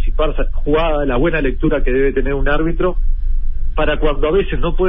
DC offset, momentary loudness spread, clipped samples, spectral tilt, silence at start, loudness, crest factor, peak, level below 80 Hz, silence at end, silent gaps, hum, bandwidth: under 0.1%; 8 LU; under 0.1%; -11 dB/octave; 0 s; -18 LUFS; 10 dB; -2 dBFS; -16 dBFS; 0 s; none; none; 3.8 kHz